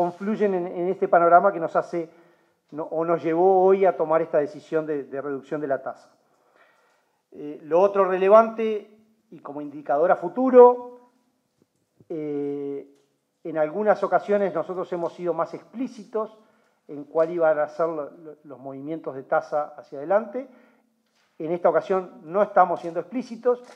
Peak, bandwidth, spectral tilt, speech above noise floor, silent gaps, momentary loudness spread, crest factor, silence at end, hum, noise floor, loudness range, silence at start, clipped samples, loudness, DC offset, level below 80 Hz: -2 dBFS; 7.2 kHz; -8 dB/octave; 46 dB; none; 19 LU; 22 dB; 0.1 s; none; -68 dBFS; 8 LU; 0 s; under 0.1%; -23 LUFS; under 0.1%; -88 dBFS